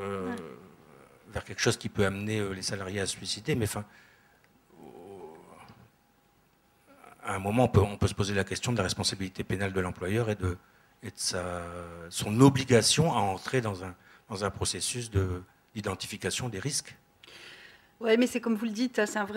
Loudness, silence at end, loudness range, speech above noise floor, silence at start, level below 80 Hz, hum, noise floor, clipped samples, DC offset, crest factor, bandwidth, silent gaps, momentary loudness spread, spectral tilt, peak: -29 LUFS; 0 s; 9 LU; 37 dB; 0 s; -54 dBFS; none; -66 dBFS; under 0.1%; under 0.1%; 24 dB; 16 kHz; none; 20 LU; -4.5 dB/octave; -6 dBFS